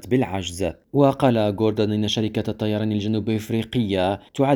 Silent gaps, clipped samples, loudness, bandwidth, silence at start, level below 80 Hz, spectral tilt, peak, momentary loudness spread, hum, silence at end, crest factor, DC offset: none; under 0.1%; -22 LUFS; 19.5 kHz; 0.05 s; -50 dBFS; -6.5 dB/octave; -2 dBFS; 6 LU; none; 0 s; 18 dB; under 0.1%